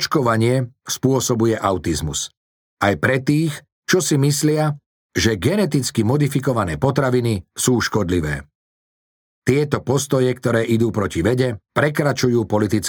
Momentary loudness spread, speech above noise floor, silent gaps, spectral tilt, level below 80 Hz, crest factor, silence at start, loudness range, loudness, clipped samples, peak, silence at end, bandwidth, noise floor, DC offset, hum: 6 LU; over 72 dB; 2.37-2.77 s, 3.72-3.82 s, 4.86-5.09 s, 8.55-9.42 s; -5 dB/octave; -44 dBFS; 18 dB; 0 s; 2 LU; -19 LUFS; under 0.1%; -2 dBFS; 0 s; over 20 kHz; under -90 dBFS; under 0.1%; none